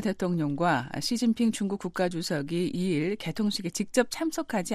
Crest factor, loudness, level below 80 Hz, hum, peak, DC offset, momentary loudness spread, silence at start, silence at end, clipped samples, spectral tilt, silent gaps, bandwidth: 18 dB; -28 LUFS; -60 dBFS; none; -10 dBFS; under 0.1%; 5 LU; 0 s; 0 s; under 0.1%; -5 dB/octave; none; 15 kHz